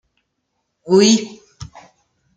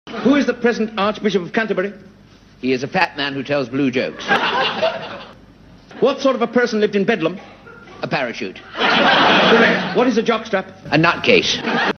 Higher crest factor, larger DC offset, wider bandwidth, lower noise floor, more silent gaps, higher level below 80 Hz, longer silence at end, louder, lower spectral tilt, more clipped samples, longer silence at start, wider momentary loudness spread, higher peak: about the same, 18 dB vs 18 dB; neither; first, 9.4 kHz vs 6.6 kHz; first, -73 dBFS vs -46 dBFS; neither; about the same, -54 dBFS vs -54 dBFS; first, 0.7 s vs 0 s; first, -14 LUFS vs -17 LUFS; about the same, -4 dB/octave vs -4.5 dB/octave; neither; first, 0.85 s vs 0.05 s; first, 26 LU vs 12 LU; about the same, -2 dBFS vs 0 dBFS